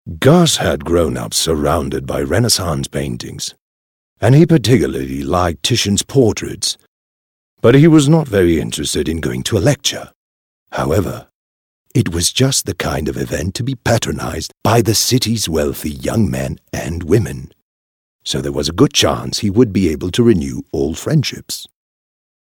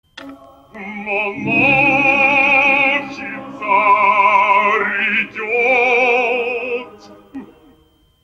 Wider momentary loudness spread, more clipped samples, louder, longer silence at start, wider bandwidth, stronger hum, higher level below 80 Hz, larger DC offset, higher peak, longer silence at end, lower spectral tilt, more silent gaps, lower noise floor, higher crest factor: second, 12 LU vs 15 LU; neither; about the same, -15 LUFS vs -13 LUFS; about the same, 0.05 s vs 0.15 s; first, 19.5 kHz vs 8 kHz; neither; first, -36 dBFS vs -56 dBFS; neither; about the same, 0 dBFS vs -2 dBFS; about the same, 0.75 s vs 0.8 s; about the same, -5 dB/octave vs -5 dB/octave; first, 3.61-4.16 s, 6.88-7.57 s, 10.15-10.66 s, 11.35-11.85 s, 17.62-18.19 s vs none; first, under -90 dBFS vs -54 dBFS; about the same, 16 dB vs 14 dB